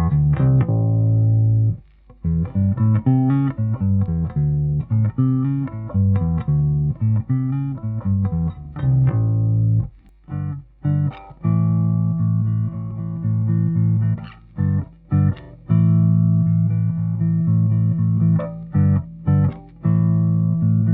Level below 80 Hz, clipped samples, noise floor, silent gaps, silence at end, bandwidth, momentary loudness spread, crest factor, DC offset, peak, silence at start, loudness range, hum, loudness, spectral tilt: -38 dBFS; under 0.1%; -41 dBFS; none; 0 s; 3 kHz; 8 LU; 12 dB; under 0.1%; -6 dBFS; 0 s; 3 LU; none; -20 LUFS; -12 dB/octave